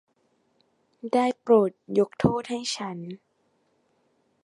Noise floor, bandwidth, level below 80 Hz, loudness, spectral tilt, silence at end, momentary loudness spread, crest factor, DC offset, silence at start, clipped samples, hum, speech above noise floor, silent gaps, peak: -70 dBFS; 11.5 kHz; -58 dBFS; -25 LUFS; -5.5 dB/octave; 1.3 s; 19 LU; 22 dB; under 0.1%; 1.05 s; under 0.1%; none; 45 dB; none; -4 dBFS